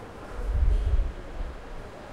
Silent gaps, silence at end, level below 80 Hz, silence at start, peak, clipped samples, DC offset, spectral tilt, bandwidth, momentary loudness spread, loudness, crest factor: none; 0 s; -28 dBFS; 0 s; -12 dBFS; under 0.1%; under 0.1%; -7 dB/octave; 8.8 kHz; 15 LU; -31 LUFS; 16 dB